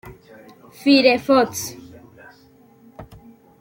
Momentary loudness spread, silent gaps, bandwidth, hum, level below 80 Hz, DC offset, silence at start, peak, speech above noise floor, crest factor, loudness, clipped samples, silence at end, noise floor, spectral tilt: 17 LU; none; 17 kHz; none; -56 dBFS; under 0.1%; 0.05 s; -2 dBFS; 35 dB; 20 dB; -17 LUFS; under 0.1%; 0.55 s; -51 dBFS; -3.5 dB/octave